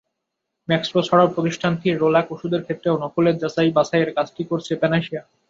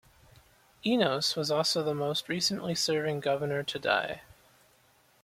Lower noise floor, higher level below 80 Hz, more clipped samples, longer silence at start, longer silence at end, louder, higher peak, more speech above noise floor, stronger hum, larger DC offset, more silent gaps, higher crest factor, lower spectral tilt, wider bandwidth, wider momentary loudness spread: first, -79 dBFS vs -65 dBFS; first, -60 dBFS vs -68 dBFS; neither; second, 0.7 s vs 0.85 s; second, 0.3 s vs 1 s; first, -20 LUFS vs -29 LUFS; first, -4 dBFS vs -10 dBFS; first, 59 dB vs 35 dB; neither; neither; neither; about the same, 18 dB vs 22 dB; first, -6.5 dB/octave vs -3.5 dB/octave; second, 7.8 kHz vs 16.5 kHz; first, 8 LU vs 5 LU